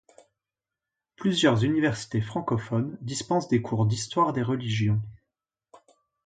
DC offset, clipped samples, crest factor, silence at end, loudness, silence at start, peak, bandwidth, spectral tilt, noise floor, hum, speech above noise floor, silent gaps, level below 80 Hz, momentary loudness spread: under 0.1%; under 0.1%; 20 dB; 1.15 s; -26 LUFS; 1.2 s; -8 dBFS; 9.4 kHz; -6 dB/octave; -89 dBFS; none; 64 dB; none; -58 dBFS; 8 LU